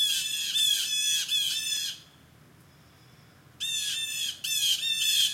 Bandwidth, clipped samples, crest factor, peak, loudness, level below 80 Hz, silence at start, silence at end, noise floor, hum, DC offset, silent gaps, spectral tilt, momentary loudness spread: 16.5 kHz; under 0.1%; 18 dB; -12 dBFS; -25 LUFS; -74 dBFS; 0 s; 0 s; -56 dBFS; none; under 0.1%; none; 3 dB/octave; 7 LU